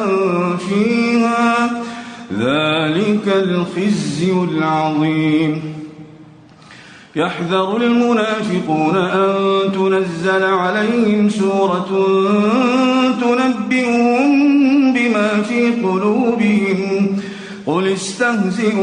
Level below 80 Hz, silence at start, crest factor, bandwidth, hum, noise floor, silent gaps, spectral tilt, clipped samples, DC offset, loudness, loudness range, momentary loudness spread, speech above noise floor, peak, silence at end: -58 dBFS; 0 s; 12 dB; 10 kHz; none; -41 dBFS; none; -6 dB/octave; under 0.1%; under 0.1%; -15 LUFS; 5 LU; 6 LU; 27 dB; -4 dBFS; 0 s